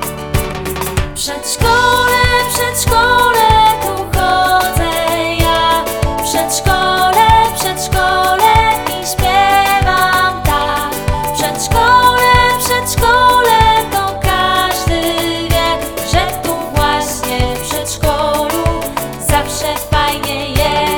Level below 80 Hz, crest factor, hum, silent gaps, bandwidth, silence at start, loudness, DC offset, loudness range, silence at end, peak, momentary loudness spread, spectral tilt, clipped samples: -24 dBFS; 12 dB; none; none; over 20 kHz; 0 s; -12 LUFS; under 0.1%; 5 LU; 0 s; 0 dBFS; 9 LU; -3.5 dB/octave; under 0.1%